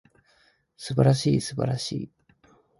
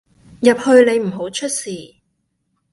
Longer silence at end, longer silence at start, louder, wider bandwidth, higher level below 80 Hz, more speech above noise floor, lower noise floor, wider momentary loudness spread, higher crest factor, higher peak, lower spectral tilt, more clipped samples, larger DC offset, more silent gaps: second, 0.7 s vs 0.85 s; first, 0.8 s vs 0.4 s; second, -25 LUFS vs -16 LUFS; about the same, 11.5 kHz vs 11.5 kHz; about the same, -56 dBFS vs -60 dBFS; second, 40 dB vs 54 dB; second, -64 dBFS vs -69 dBFS; first, 17 LU vs 14 LU; about the same, 20 dB vs 18 dB; second, -6 dBFS vs 0 dBFS; first, -6.5 dB/octave vs -4 dB/octave; neither; neither; neither